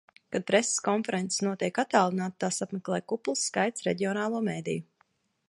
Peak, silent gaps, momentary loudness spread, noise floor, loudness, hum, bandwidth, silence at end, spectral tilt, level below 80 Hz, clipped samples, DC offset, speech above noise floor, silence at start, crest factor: -6 dBFS; none; 8 LU; -71 dBFS; -29 LUFS; none; 11.5 kHz; 0.65 s; -4 dB/octave; -74 dBFS; under 0.1%; under 0.1%; 42 dB; 0.3 s; 22 dB